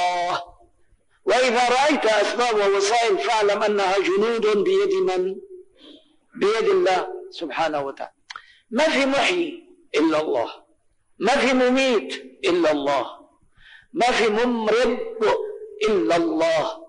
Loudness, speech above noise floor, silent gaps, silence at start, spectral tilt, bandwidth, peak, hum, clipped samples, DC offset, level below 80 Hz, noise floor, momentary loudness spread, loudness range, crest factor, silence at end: -21 LUFS; 42 dB; none; 0 s; -3.5 dB/octave; 10 kHz; -12 dBFS; none; under 0.1%; under 0.1%; -58 dBFS; -62 dBFS; 12 LU; 4 LU; 10 dB; 0 s